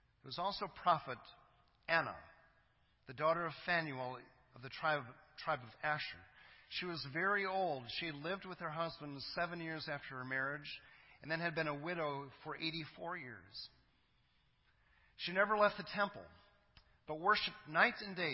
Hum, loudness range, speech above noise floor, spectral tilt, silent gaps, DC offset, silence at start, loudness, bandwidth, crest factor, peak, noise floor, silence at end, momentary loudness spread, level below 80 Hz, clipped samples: none; 5 LU; 35 dB; -2 dB/octave; none; under 0.1%; 0.25 s; -39 LUFS; 5.8 kHz; 26 dB; -14 dBFS; -75 dBFS; 0 s; 16 LU; -74 dBFS; under 0.1%